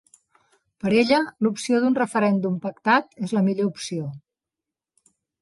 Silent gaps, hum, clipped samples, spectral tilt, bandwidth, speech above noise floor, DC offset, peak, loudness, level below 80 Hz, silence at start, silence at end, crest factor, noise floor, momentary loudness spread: none; none; under 0.1%; -5.5 dB/octave; 11.5 kHz; 66 dB; under 0.1%; -6 dBFS; -22 LUFS; -66 dBFS; 0.85 s; 1.25 s; 18 dB; -88 dBFS; 10 LU